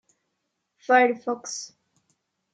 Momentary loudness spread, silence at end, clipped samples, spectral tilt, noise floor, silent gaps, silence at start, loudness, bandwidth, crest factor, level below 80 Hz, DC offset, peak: 22 LU; 0.85 s; under 0.1%; -2 dB/octave; -79 dBFS; none; 0.9 s; -23 LUFS; 9.4 kHz; 20 dB; -88 dBFS; under 0.1%; -6 dBFS